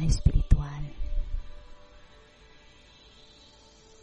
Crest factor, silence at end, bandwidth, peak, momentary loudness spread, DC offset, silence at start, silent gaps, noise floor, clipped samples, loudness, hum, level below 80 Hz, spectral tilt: 22 dB; 2.25 s; 10 kHz; -8 dBFS; 27 LU; under 0.1%; 0 s; none; -55 dBFS; under 0.1%; -30 LUFS; none; -30 dBFS; -6.5 dB/octave